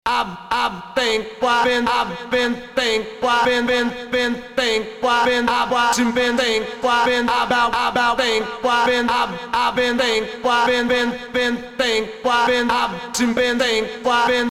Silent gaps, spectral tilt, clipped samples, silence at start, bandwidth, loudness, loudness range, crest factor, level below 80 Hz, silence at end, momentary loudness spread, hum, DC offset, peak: none; -2.5 dB/octave; under 0.1%; 0.05 s; 16 kHz; -19 LUFS; 2 LU; 16 dB; -48 dBFS; 0 s; 5 LU; none; under 0.1%; -4 dBFS